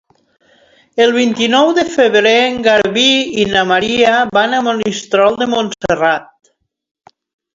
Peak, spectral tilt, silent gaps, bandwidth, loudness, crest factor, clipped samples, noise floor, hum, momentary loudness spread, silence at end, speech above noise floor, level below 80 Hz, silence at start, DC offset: 0 dBFS; -3.5 dB/octave; none; 7.8 kHz; -12 LUFS; 14 dB; under 0.1%; -50 dBFS; none; 6 LU; 1.3 s; 38 dB; -50 dBFS; 0.95 s; under 0.1%